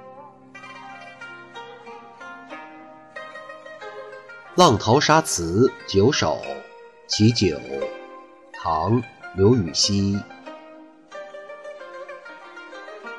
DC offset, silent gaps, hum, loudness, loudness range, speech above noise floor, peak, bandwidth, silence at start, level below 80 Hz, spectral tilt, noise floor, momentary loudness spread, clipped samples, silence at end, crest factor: under 0.1%; none; none; -20 LUFS; 19 LU; 26 dB; -4 dBFS; 11.5 kHz; 0.05 s; -52 dBFS; -4.5 dB/octave; -46 dBFS; 23 LU; under 0.1%; 0 s; 20 dB